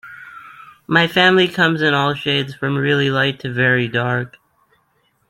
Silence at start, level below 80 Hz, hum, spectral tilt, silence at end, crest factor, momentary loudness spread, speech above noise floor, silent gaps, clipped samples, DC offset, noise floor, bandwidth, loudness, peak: 0.05 s; -58 dBFS; none; -6 dB/octave; 1 s; 18 dB; 20 LU; 46 dB; none; under 0.1%; under 0.1%; -63 dBFS; 16.5 kHz; -16 LUFS; -2 dBFS